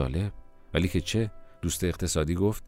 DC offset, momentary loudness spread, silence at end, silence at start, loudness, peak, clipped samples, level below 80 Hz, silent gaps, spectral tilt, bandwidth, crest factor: under 0.1%; 8 LU; 0 s; 0 s; -29 LUFS; -10 dBFS; under 0.1%; -40 dBFS; none; -5 dB/octave; 16 kHz; 18 dB